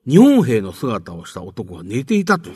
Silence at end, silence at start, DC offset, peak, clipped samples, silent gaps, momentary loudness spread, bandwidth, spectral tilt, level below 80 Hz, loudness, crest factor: 0 s; 0.05 s; under 0.1%; 0 dBFS; under 0.1%; none; 21 LU; 13.5 kHz; -7 dB/octave; -54 dBFS; -16 LUFS; 16 dB